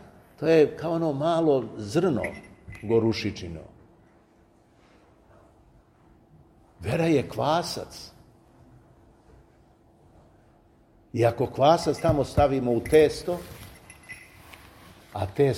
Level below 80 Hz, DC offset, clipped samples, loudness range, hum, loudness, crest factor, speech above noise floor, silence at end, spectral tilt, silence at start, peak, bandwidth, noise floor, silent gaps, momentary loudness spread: -50 dBFS; under 0.1%; under 0.1%; 10 LU; none; -25 LUFS; 22 dB; 35 dB; 0 s; -6.5 dB/octave; 0.4 s; -6 dBFS; 16 kHz; -59 dBFS; none; 23 LU